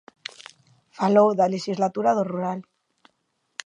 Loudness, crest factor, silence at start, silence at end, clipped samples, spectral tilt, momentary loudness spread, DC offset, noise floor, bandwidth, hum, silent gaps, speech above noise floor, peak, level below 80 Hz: -22 LUFS; 20 dB; 1 s; 1.05 s; under 0.1%; -6 dB/octave; 20 LU; under 0.1%; -72 dBFS; 10.5 kHz; none; none; 51 dB; -4 dBFS; -78 dBFS